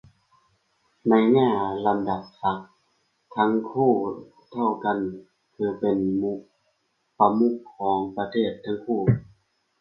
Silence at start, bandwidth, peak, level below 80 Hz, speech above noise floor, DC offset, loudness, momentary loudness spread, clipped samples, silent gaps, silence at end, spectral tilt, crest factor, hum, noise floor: 1.05 s; 5.6 kHz; -4 dBFS; -58 dBFS; 48 dB; under 0.1%; -24 LUFS; 12 LU; under 0.1%; none; 0.55 s; -10 dB/octave; 22 dB; none; -72 dBFS